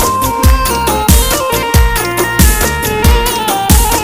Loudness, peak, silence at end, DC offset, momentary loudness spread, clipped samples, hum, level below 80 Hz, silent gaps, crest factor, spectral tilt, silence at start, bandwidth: -11 LUFS; 0 dBFS; 0 s; under 0.1%; 3 LU; 0.6%; none; -14 dBFS; none; 10 dB; -4 dB/octave; 0 s; 19.5 kHz